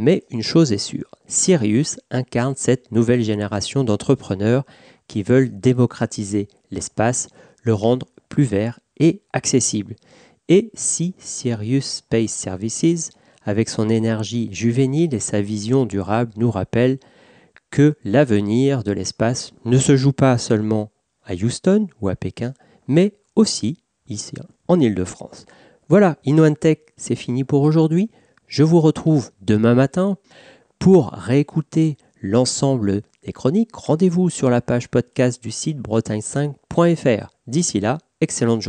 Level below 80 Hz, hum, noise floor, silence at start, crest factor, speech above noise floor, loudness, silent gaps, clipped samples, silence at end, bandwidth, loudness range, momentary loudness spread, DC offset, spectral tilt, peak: -54 dBFS; none; -52 dBFS; 0 s; 16 dB; 33 dB; -19 LUFS; none; under 0.1%; 0 s; 10 kHz; 3 LU; 11 LU; under 0.1%; -6 dB/octave; -4 dBFS